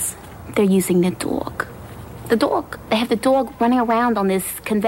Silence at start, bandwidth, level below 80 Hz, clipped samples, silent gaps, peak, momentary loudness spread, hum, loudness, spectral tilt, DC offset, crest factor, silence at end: 0 s; 16.5 kHz; -48 dBFS; under 0.1%; none; -6 dBFS; 13 LU; none; -20 LUFS; -5 dB/octave; under 0.1%; 14 dB; 0 s